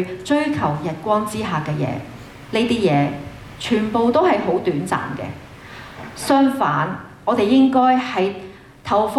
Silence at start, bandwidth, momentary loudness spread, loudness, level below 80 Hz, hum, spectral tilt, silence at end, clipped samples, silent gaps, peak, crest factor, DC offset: 0 s; 13.5 kHz; 19 LU; -19 LUFS; -50 dBFS; none; -6 dB/octave; 0 s; under 0.1%; none; -4 dBFS; 14 dB; under 0.1%